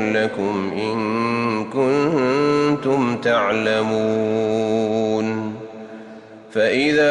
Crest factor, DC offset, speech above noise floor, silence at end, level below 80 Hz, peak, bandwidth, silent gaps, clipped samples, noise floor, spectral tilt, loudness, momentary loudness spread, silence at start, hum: 12 dB; under 0.1%; 21 dB; 0 s; -60 dBFS; -6 dBFS; 10 kHz; none; under 0.1%; -40 dBFS; -6 dB/octave; -20 LUFS; 11 LU; 0 s; none